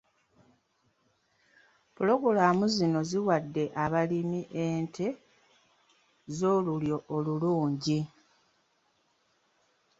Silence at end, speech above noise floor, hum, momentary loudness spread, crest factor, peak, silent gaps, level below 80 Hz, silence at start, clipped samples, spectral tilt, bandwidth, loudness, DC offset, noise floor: 1.9 s; 44 dB; none; 9 LU; 22 dB; -10 dBFS; none; -68 dBFS; 2 s; under 0.1%; -6.5 dB/octave; 8 kHz; -29 LUFS; under 0.1%; -73 dBFS